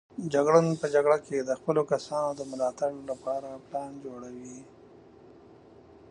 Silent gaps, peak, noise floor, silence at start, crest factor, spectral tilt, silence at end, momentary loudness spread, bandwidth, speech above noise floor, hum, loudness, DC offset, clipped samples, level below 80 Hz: none; -8 dBFS; -53 dBFS; 0.15 s; 22 dB; -6 dB/octave; 0.55 s; 19 LU; 11 kHz; 25 dB; none; -28 LUFS; under 0.1%; under 0.1%; -68 dBFS